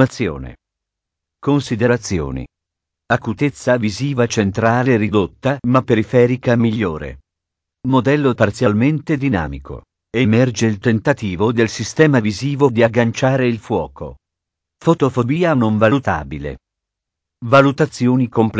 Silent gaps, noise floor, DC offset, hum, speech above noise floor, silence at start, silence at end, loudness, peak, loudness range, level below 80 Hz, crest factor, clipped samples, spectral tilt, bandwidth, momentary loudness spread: none; -82 dBFS; under 0.1%; none; 66 dB; 0 s; 0 s; -16 LUFS; 0 dBFS; 3 LU; -40 dBFS; 16 dB; under 0.1%; -6.5 dB/octave; 8 kHz; 13 LU